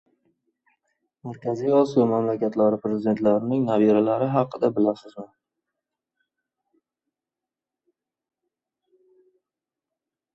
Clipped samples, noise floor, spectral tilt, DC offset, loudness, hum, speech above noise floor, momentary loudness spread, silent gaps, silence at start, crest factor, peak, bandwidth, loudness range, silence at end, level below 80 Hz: under 0.1%; -89 dBFS; -9 dB/octave; under 0.1%; -22 LUFS; none; 67 dB; 16 LU; none; 1.25 s; 20 dB; -6 dBFS; 8 kHz; 9 LU; 5.1 s; -68 dBFS